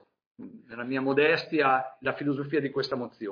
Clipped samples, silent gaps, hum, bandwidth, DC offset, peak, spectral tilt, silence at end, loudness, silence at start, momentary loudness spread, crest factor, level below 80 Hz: under 0.1%; none; none; 5.2 kHz; under 0.1%; -10 dBFS; -7 dB/octave; 0 s; -27 LUFS; 0.4 s; 16 LU; 18 dB; -72 dBFS